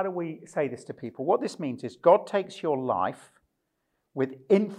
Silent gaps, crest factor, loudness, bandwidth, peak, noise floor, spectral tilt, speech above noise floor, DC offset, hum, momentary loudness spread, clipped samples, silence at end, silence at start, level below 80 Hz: none; 22 dB; -27 LUFS; 11 kHz; -6 dBFS; -78 dBFS; -7 dB/octave; 51 dB; under 0.1%; none; 14 LU; under 0.1%; 0 s; 0 s; -78 dBFS